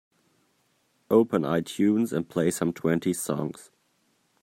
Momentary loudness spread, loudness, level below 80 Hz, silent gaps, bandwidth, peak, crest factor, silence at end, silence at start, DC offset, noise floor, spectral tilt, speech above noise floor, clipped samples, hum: 8 LU; -26 LUFS; -66 dBFS; none; 16 kHz; -6 dBFS; 20 dB; 0.8 s; 1.1 s; under 0.1%; -69 dBFS; -6 dB/octave; 44 dB; under 0.1%; none